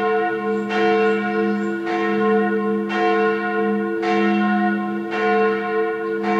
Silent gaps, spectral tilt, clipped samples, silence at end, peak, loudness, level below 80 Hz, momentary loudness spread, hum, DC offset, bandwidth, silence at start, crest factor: none; -7 dB/octave; under 0.1%; 0 s; -6 dBFS; -20 LUFS; -76 dBFS; 5 LU; none; under 0.1%; 7.8 kHz; 0 s; 12 dB